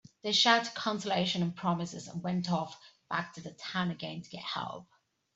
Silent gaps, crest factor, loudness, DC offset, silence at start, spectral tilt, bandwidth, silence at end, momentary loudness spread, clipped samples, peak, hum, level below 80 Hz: none; 26 dB; -32 LUFS; under 0.1%; 0.25 s; -4 dB/octave; 8 kHz; 0.5 s; 16 LU; under 0.1%; -8 dBFS; none; -74 dBFS